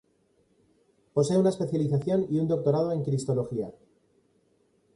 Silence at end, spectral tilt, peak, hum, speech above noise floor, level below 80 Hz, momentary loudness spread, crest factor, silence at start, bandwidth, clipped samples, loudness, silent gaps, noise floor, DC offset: 1.25 s; -8 dB/octave; -12 dBFS; none; 42 dB; -64 dBFS; 8 LU; 16 dB; 1.15 s; 11.5 kHz; under 0.1%; -27 LUFS; none; -68 dBFS; under 0.1%